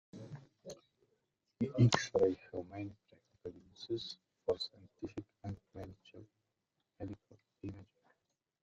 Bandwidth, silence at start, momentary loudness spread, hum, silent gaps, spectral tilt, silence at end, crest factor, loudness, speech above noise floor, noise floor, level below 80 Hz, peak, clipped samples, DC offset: 7.8 kHz; 0.15 s; 23 LU; none; none; -6 dB/octave; 0.8 s; 30 dB; -38 LUFS; 52 dB; -86 dBFS; -70 dBFS; -10 dBFS; under 0.1%; under 0.1%